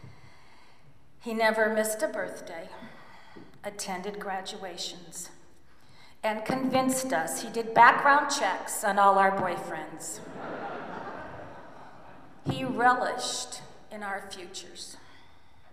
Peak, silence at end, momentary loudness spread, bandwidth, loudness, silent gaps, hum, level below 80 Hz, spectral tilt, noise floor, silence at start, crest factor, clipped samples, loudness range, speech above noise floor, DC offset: -4 dBFS; 0.75 s; 21 LU; 15.5 kHz; -27 LUFS; none; none; -66 dBFS; -3 dB/octave; -60 dBFS; 0.05 s; 24 dB; under 0.1%; 14 LU; 32 dB; 0.4%